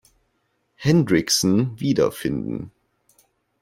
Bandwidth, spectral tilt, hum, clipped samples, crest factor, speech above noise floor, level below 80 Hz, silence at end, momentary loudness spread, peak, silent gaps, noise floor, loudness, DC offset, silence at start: 16.5 kHz; -5 dB/octave; none; under 0.1%; 18 dB; 50 dB; -52 dBFS; 0.9 s; 12 LU; -4 dBFS; none; -70 dBFS; -21 LUFS; under 0.1%; 0.8 s